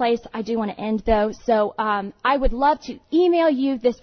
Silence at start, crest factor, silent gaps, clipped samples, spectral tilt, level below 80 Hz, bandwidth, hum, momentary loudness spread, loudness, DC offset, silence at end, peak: 0 s; 14 dB; none; under 0.1%; -6.5 dB/octave; -36 dBFS; 6.6 kHz; none; 7 LU; -21 LUFS; under 0.1%; 0.1 s; -6 dBFS